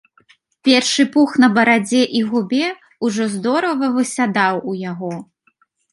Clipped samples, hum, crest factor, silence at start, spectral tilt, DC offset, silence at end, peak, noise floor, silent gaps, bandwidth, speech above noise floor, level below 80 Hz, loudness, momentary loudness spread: under 0.1%; none; 16 dB; 0.65 s; -4 dB/octave; under 0.1%; 0.7 s; -2 dBFS; -61 dBFS; none; 11.5 kHz; 45 dB; -66 dBFS; -17 LUFS; 12 LU